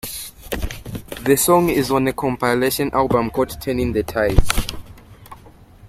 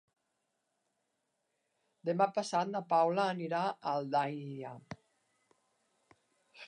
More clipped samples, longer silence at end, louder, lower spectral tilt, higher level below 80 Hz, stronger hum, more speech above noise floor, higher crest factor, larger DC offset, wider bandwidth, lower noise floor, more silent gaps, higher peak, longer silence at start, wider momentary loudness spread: neither; about the same, 0 s vs 0 s; first, -19 LUFS vs -34 LUFS; about the same, -4.5 dB/octave vs -5.5 dB/octave; first, -28 dBFS vs -82 dBFS; neither; second, 27 dB vs 50 dB; about the same, 18 dB vs 22 dB; neither; first, 16.5 kHz vs 10.5 kHz; second, -44 dBFS vs -83 dBFS; neither; first, 0 dBFS vs -16 dBFS; second, 0.05 s vs 2.05 s; about the same, 15 LU vs 16 LU